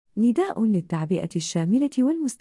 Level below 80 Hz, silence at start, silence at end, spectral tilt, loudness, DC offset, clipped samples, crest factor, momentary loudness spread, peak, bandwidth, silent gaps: -66 dBFS; 0.15 s; 0.05 s; -6.5 dB/octave; -23 LUFS; under 0.1%; under 0.1%; 10 dB; 4 LU; -12 dBFS; 12 kHz; none